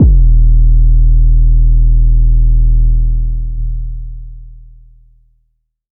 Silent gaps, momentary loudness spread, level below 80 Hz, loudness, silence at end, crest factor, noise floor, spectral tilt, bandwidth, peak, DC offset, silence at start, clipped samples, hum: none; 14 LU; -8 dBFS; -13 LUFS; 1.4 s; 8 dB; -62 dBFS; -16 dB/octave; 0.7 kHz; 0 dBFS; under 0.1%; 0 s; under 0.1%; none